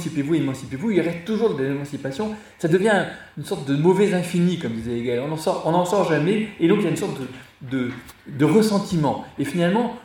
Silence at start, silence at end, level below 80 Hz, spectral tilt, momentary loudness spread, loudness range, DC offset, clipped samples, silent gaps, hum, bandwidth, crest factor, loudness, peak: 0 s; 0 s; -56 dBFS; -6.5 dB/octave; 11 LU; 2 LU; under 0.1%; under 0.1%; none; none; 17 kHz; 16 dB; -22 LUFS; -4 dBFS